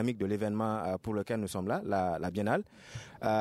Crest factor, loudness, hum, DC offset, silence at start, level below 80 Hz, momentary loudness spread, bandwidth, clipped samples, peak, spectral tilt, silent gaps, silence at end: 16 dB; -33 LUFS; none; under 0.1%; 0 s; -64 dBFS; 5 LU; 14.5 kHz; under 0.1%; -16 dBFS; -6.5 dB/octave; none; 0 s